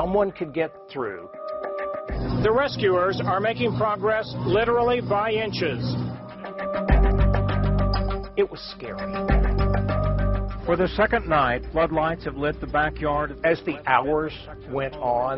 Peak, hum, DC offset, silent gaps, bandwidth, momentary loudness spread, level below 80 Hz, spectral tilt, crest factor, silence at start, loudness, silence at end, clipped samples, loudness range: -4 dBFS; none; under 0.1%; none; 5.8 kHz; 10 LU; -30 dBFS; -5 dB/octave; 18 dB; 0 s; -24 LUFS; 0 s; under 0.1%; 2 LU